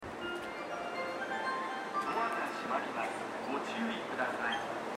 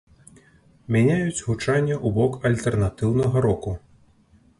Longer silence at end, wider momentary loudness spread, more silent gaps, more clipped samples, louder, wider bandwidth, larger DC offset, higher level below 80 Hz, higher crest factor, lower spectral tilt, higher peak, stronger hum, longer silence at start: second, 0 s vs 0.8 s; about the same, 6 LU vs 6 LU; neither; neither; second, -36 LUFS vs -22 LUFS; first, 16 kHz vs 11.5 kHz; neither; second, -72 dBFS vs -44 dBFS; about the same, 16 dB vs 16 dB; second, -3.5 dB/octave vs -7 dB/octave; second, -20 dBFS vs -6 dBFS; neither; second, 0 s vs 0.9 s